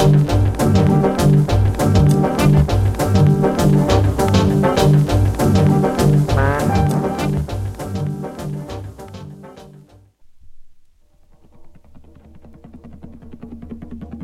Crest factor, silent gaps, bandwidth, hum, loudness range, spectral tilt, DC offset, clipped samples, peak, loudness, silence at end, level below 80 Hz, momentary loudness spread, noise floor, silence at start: 14 dB; none; 15 kHz; none; 15 LU; -7 dB/octave; under 0.1%; under 0.1%; -2 dBFS; -16 LUFS; 0 s; -30 dBFS; 20 LU; -50 dBFS; 0 s